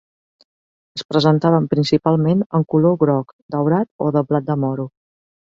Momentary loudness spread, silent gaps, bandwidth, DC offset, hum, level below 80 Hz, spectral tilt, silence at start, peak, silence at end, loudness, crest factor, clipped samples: 11 LU; 1.05-1.09 s, 2.46-2.50 s, 3.33-3.49 s, 3.91-3.99 s; 7.6 kHz; under 0.1%; none; -58 dBFS; -8 dB/octave; 0.95 s; -2 dBFS; 0.55 s; -18 LUFS; 16 dB; under 0.1%